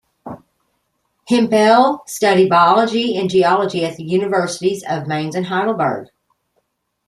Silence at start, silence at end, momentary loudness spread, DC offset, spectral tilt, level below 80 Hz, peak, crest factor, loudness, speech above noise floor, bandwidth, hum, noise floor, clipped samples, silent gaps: 0.25 s; 1.05 s; 10 LU; under 0.1%; -5 dB/octave; -62 dBFS; -2 dBFS; 16 dB; -16 LUFS; 53 dB; 14 kHz; none; -68 dBFS; under 0.1%; none